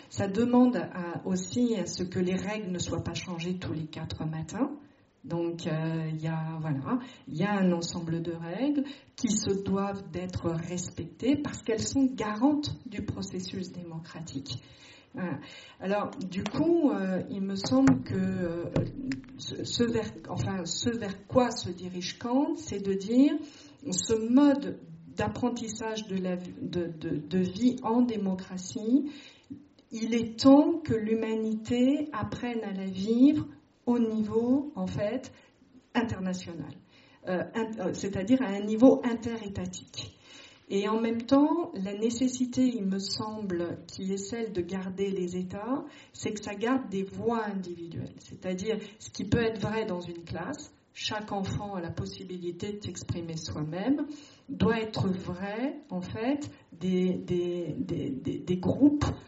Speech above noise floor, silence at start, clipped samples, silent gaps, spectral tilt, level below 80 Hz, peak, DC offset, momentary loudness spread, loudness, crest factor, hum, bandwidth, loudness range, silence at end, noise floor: 23 dB; 0 s; under 0.1%; none; -6 dB/octave; -58 dBFS; -8 dBFS; under 0.1%; 14 LU; -30 LUFS; 22 dB; none; 8 kHz; 7 LU; 0 s; -53 dBFS